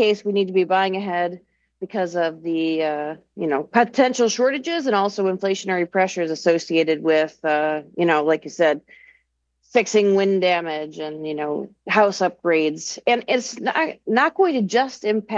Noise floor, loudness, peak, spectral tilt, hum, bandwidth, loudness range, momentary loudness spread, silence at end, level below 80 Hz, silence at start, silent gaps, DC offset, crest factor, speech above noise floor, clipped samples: -68 dBFS; -21 LUFS; -4 dBFS; -4.5 dB/octave; none; 8 kHz; 2 LU; 9 LU; 0 s; -70 dBFS; 0 s; none; under 0.1%; 18 dB; 47 dB; under 0.1%